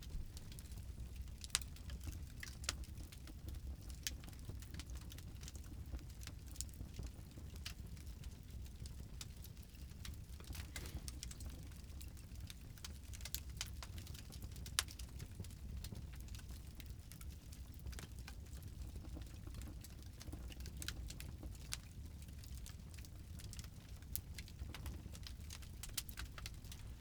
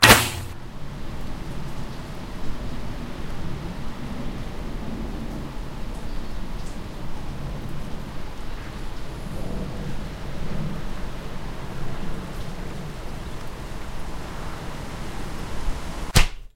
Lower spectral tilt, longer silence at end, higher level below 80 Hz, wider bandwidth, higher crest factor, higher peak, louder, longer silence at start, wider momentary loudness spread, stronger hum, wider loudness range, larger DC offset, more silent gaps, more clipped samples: about the same, -3 dB/octave vs -3.5 dB/octave; about the same, 0 s vs 0.1 s; second, -54 dBFS vs -32 dBFS; first, over 20 kHz vs 16 kHz; first, 38 dB vs 26 dB; second, -10 dBFS vs 0 dBFS; second, -50 LUFS vs -30 LUFS; about the same, 0 s vs 0 s; first, 8 LU vs 5 LU; neither; first, 5 LU vs 2 LU; neither; neither; neither